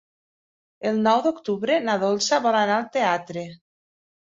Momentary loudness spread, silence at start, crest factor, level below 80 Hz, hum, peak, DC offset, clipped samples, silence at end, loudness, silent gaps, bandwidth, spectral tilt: 11 LU; 0.8 s; 18 dB; -70 dBFS; none; -6 dBFS; under 0.1%; under 0.1%; 0.75 s; -22 LUFS; none; 7.8 kHz; -4 dB/octave